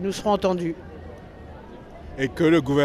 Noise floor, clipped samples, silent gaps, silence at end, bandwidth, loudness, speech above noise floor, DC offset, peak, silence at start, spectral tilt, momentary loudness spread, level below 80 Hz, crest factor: -41 dBFS; under 0.1%; none; 0 s; 14 kHz; -23 LUFS; 20 dB; under 0.1%; -8 dBFS; 0 s; -6 dB/octave; 23 LU; -46 dBFS; 16 dB